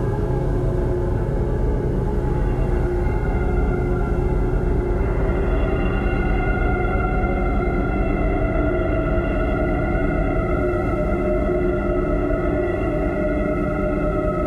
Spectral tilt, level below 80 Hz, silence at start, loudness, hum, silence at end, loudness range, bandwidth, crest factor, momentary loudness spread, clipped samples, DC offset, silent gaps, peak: -9.5 dB/octave; -24 dBFS; 0 s; -22 LUFS; none; 0 s; 1 LU; 4.6 kHz; 12 dB; 1 LU; under 0.1%; under 0.1%; none; -8 dBFS